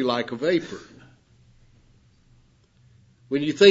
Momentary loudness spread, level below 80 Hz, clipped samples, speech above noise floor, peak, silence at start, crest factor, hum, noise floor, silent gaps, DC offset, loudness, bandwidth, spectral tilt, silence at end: 17 LU; -62 dBFS; under 0.1%; 38 dB; -2 dBFS; 0 s; 22 dB; none; -58 dBFS; none; under 0.1%; -23 LUFS; 8 kHz; -5 dB/octave; 0 s